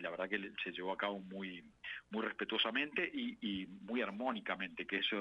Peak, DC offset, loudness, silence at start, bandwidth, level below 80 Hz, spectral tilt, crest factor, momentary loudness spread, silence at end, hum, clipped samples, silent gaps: -22 dBFS; under 0.1%; -40 LUFS; 0 s; 9 kHz; -76 dBFS; -6 dB/octave; 20 dB; 11 LU; 0 s; none; under 0.1%; none